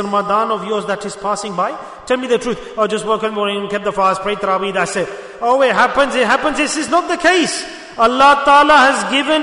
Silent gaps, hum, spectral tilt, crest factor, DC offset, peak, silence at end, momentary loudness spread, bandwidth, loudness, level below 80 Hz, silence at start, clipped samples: none; none; -3 dB/octave; 14 dB; under 0.1%; 0 dBFS; 0 s; 12 LU; 11 kHz; -15 LUFS; -48 dBFS; 0 s; under 0.1%